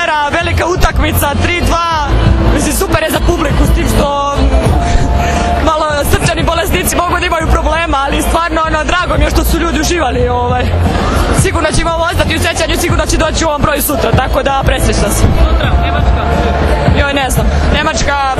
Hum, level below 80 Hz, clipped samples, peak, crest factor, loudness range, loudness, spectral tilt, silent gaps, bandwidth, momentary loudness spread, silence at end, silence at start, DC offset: none; -16 dBFS; 0.3%; 0 dBFS; 10 dB; 1 LU; -11 LUFS; -5 dB/octave; none; 14.5 kHz; 1 LU; 0 s; 0 s; under 0.1%